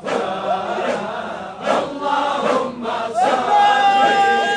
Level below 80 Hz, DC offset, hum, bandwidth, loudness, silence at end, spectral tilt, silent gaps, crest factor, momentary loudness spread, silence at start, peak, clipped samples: -60 dBFS; under 0.1%; none; 10 kHz; -18 LUFS; 0 s; -3.5 dB/octave; none; 16 dB; 10 LU; 0 s; -2 dBFS; under 0.1%